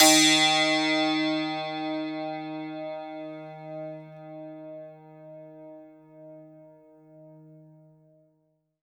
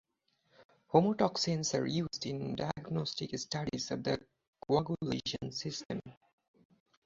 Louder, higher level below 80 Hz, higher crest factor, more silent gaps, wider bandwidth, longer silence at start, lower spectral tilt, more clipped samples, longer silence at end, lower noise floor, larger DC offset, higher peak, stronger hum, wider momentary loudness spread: first, -24 LUFS vs -35 LUFS; second, -82 dBFS vs -64 dBFS; about the same, 24 dB vs 24 dB; second, none vs 0.65-0.69 s, 4.47-4.53 s, 5.85-5.89 s; first, 19.5 kHz vs 7.6 kHz; second, 0 s vs 0.6 s; second, -1.5 dB/octave vs -5 dB/octave; neither; first, 1.45 s vs 0.95 s; second, -72 dBFS vs -76 dBFS; neither; first, -4 dBFS vs -12 dBFS; first, 50 Hz at -80 dBFS vs none; first, 27 LU vs 9 LU